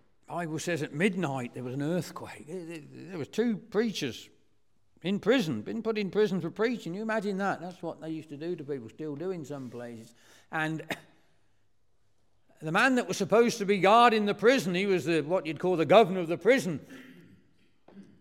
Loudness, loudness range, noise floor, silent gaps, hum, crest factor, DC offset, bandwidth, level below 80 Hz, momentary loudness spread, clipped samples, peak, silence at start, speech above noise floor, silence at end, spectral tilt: -28 LUFS; 13 LU; -75 dBFS; none; none; 22 dB; under 0.1%; 16.5 kHz; -76 dBFS; 18 LU; under 0.1%; -6 dBFS; 0.3 s; 47 dB; 0.2 s; -5.5 dB/octave